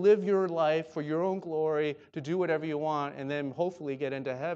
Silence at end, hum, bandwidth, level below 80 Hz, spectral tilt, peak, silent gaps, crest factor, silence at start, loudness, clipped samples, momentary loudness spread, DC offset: 0 s; none; 7.6 kHz; -78 dBFS; -7.5 dB/octave; -12 dBFS; none; 16 dB; 0 s; -31 LUFS; under 0.1%; 7 LU; under 0.1%